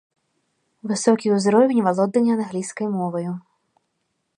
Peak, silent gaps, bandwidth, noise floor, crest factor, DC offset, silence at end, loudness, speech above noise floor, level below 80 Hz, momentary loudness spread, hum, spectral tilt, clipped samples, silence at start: -2 dBFS; none; 11 kHz; -74 dBFS; 18 dB; under 0.1%; 1 s; -20 LUFS; 54 dB; -72 dBFS; 12 LU; none; -6 dB/octave; under 0.1%; 0.85 s